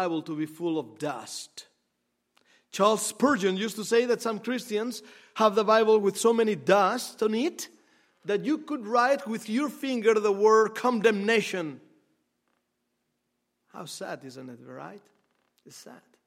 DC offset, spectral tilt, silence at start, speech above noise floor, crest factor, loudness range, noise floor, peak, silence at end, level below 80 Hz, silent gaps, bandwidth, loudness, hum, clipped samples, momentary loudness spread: under 0.1%; -4 dB/octave; 0 s; 52 dB; 22 dB; 19 LU; -79 dBFS; -6 dBFS; 0.3 s; -82 dBFS; none; 15.5 kHz; -26 LUFS; none; under 0.1%; 19 LU